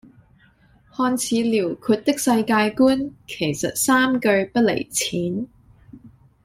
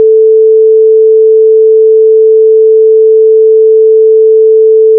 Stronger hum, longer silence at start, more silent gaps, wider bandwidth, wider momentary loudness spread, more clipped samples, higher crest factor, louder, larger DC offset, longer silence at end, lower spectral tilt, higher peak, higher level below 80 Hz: neither; first, 1 s vs 0 s; neither; first, 16 kHz vs 0.5 kHz; first, 9 LU vs 0 LU; neither; first, 18 dB vs 4 dB; second, -20 LUFS vs -4 LUFS; neither; first, 0.35 s vs 0 s; second, -4 dB/octave vs -14 dB/octave; second, -4 dBFS vs 0 dBFS; first, -56 dBFS vs under -90 dBFS